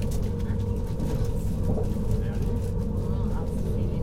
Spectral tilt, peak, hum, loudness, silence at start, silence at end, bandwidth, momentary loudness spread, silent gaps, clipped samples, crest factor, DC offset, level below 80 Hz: -8.5 dB/octave; -14 dBFS; none; -29 LUFS; 0 s; 0 s; 16 kHz; 2 LU; none; under 0.1%; 12 dB; under 0.1%; -30 dBFS